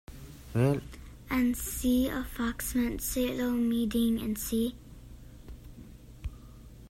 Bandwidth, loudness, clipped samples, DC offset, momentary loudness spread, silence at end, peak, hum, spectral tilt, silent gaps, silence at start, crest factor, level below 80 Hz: 16 kHz; -30 LUFS; under 0.1%; under 0.1%; 23 LU; 0 s; -14 dBFS; none; -5.5 dB/octave; none; 0.1 s; 18 dB; -46 dBFS